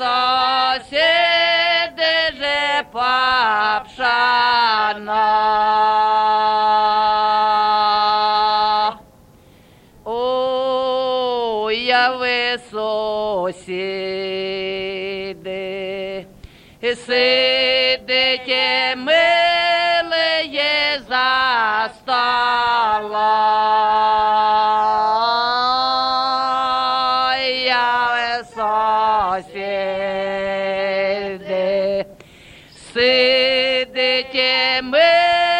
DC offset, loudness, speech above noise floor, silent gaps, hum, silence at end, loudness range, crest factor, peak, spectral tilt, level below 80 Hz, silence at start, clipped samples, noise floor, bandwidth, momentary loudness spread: under 0.1%; -17 LUFS; 31 dB; none; none; 0 s; 6 LU; 16 dB; -2 dBFS; -3 dB/octave; -54 dBFS; 0 s; under 0.1%; -48 dBFS; 10.5 kHz; 9 LU